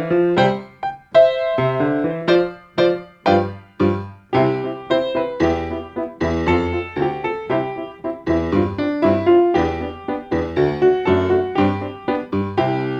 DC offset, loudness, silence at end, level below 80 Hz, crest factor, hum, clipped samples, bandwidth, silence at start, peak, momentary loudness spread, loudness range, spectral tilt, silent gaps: under 0.1%; -19 LUFS; 0 s; -42 dBFS; 16 dB; none; under 0.1%; 7.4 kHz; 0 s; -2 dBFS; 11 LU; 3 LU; -8 dB/octave; none